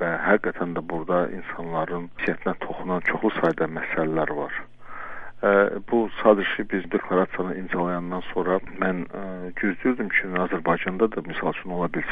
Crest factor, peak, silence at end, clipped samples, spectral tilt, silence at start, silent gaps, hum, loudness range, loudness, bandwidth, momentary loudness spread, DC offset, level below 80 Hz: 22 dB; -2 dBFS; 0 s; under 0.1%; -8.5 dB/octave; 0 s; none; none; 3 LU; -25 LUFS; 5.2 kHz; 10 LU; under 0.1%; -52 dBFS